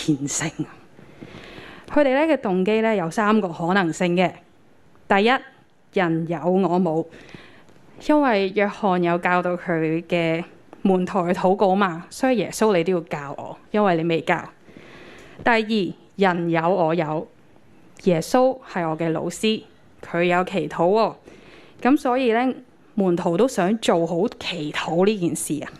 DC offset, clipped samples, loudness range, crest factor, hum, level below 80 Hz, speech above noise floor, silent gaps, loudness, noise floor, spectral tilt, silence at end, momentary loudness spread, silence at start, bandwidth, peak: under 0.1%; under 0.1%; 2 LU; 20 dB; none; -58 dBFS; 35 dB; none; -21 LUFS; -56 dBFS; -5.5 dB/octave; 0.05 s; 10 LU; 0 s; 13.5 kHz; -2 dBFS